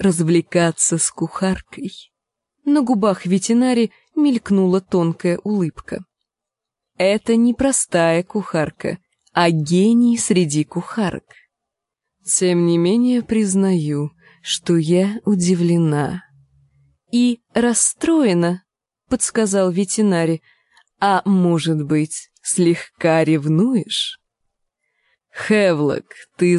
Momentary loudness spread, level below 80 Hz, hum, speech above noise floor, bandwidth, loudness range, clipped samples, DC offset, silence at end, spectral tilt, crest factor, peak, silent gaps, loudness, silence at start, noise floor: 10 LU; -52 dBFS; none; 68 dB; 11.5 kHz; 2 LU; under 0.1%; under 0.1%; 0 s; -5 dB/octave; 16 dB; -2 dBFS; none; -18 LUFS; 0 s; -85 dBFS